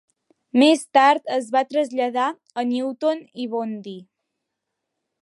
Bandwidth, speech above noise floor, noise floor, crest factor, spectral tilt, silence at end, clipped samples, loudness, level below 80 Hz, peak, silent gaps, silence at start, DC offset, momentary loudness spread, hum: 11.5 kHz; 60 dB; -81 dBFS; 18 dB; -3.5 dB/octave; 1.2 s; under 0.1%; -21 LUFS; -80 dBFS; -4 dBFS; none; 0.55 s; under 0.1%; 13 LU; none